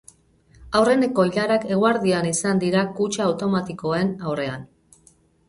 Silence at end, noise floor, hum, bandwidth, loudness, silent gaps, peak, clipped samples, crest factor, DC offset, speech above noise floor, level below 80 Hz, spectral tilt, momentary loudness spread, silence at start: 0.85 s; -57 dBFS; none; 11.5 kHz; -21 LUFS; none; -6 dBFS; under 0.1%; 16 dB; under 0.1%; 36 dB; -56 dBFS; -5 dB/octave; 8 LU; 0.6 s